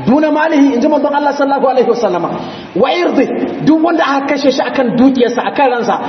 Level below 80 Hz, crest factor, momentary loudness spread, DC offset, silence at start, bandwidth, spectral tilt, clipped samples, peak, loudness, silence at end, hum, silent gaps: -54 dBFS; 12 dB; 5 LU; under 0.1%; 0 s; 6.4 kHz; -6 dB/octave; under 0.1%; 0 dBFS; -12 LUFS; 0 s; none; none